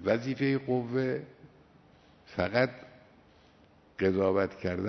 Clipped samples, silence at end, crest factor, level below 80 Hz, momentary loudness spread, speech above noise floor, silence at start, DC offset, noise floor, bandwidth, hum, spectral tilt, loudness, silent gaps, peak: under 0.1%; 0 s; 20 dB; -64 dBFS; 14 LU; 31 dB; 0 s; under 0.1%; -60 dBFS; 6.4 kHz; none; -8 dB/octave; -30 LUFS; none; -12 dBFS